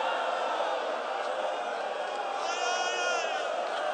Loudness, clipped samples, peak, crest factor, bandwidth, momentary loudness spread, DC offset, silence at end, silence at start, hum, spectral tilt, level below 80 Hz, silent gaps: -31 LUFS; under 0.1%; -18 dBFS; 14 dB; 9.4 kHz; 4 LU; under 0.1%; 0 s; 0 s; none; 0 dB/octave; -90 dBFS; none